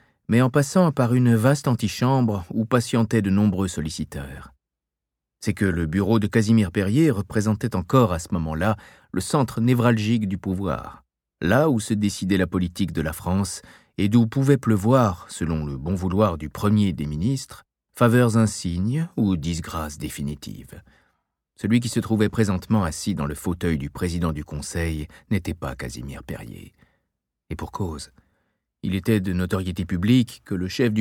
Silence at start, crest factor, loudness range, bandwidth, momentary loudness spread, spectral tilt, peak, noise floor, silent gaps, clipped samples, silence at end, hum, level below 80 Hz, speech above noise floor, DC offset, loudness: 0.3 s; 18 dB; 7 LU; 17 kHz; 12 LU; -6.5 dB/octave; -4 dBFS; -86 dBFS; none; under 0.1%; 0 s; none; -44 dBFS; 64 dB; under 0.1%; -23 LUFS